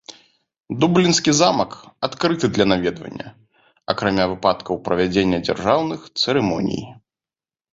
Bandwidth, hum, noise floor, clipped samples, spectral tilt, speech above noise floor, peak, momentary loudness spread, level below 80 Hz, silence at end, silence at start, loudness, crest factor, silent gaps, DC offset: 7.8 kHz; none; under -90 dBFS; under 0.1%; -4.5 dB/octave; over 71 dB; -2 dBFS; 16 LU; -50 dBFS; 0.8 s; 0.1 s; -19 LUFS; 18 dB; none; under 0.1%